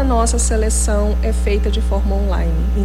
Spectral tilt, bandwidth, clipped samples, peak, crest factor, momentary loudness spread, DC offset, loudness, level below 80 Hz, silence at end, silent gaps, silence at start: -5.5 dB/octave; 12.5 kHz; under 0.1%; -4 dBFS; 10 dB; 3 LU; under 0.1%; -18 LUFS; -16 dBFS; 0 s; none; 0 s